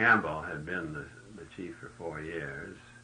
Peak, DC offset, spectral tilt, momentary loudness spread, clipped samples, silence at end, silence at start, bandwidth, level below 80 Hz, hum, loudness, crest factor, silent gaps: -12 dBFS; under 0.1%; -6 dB/octave; 17 LU; under 0.1%; 0 s; 0 s; 10 kHz; -60 dBFS; none; -35 LUFS; 22 dB; none